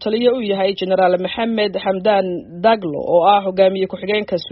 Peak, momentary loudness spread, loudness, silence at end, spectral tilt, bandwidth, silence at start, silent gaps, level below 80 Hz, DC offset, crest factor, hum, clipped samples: -2 dBFS; 6 LU; -17 LUFS; 0 s; -3.5 dB/octave; 5.8 kHz; 0 s; none; -56 dBFS; under 0.1%; 16 dB; none; under 0.1%